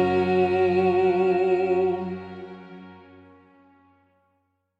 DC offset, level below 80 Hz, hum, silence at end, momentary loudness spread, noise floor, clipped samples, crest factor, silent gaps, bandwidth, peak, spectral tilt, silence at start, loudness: under 0.1%; -64 dBFS; none; 1.85 s; 21 LU; -72 dBFS; under 0.1%; 14 dB; none; 5.4 kHz; -10 dBFS; -8.5 dB/octave; 0 s; -22 LUFS